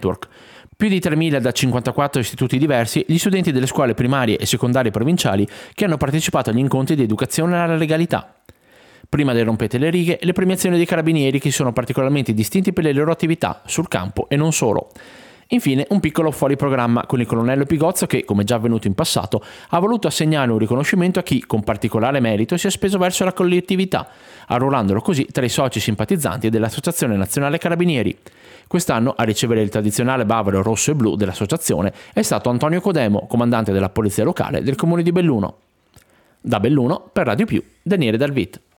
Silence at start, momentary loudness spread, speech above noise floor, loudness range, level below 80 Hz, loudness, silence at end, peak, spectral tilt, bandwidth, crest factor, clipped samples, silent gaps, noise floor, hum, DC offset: 0 s; 5 LU; 35 dB; 2 LU; -50 dBFS; -18 LUFS; 0.2 s; -4 dBFS; -5.5 dB/octave; 19.5 kHz; 14 dB; under 0.1%; none; -53 dBFS; none; under 0.1%